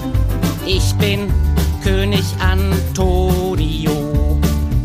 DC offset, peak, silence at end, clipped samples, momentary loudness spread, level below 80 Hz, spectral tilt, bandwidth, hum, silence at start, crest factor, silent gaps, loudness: under 0.1%; -2 dBFS; 0 s; under 0.1%; 3 LU; -20 dBFS; -6 dB/octave; 15.5 kHz; none; 0 s; 12 dB; none; -17 LUFS